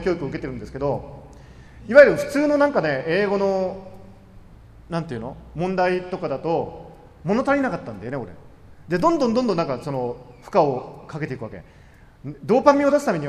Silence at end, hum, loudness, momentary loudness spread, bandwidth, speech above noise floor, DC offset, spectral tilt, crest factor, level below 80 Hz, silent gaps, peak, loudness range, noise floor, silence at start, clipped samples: 0 s; none; -21 LUFS; 19 LU; 13 kHz; 24 dB; under 0.1%; -6.5 dB/octave; 22 dB; -48 dBFS; none; 0 dBFS; 7 LU; -45 dBFS; 0 s; under 0.1%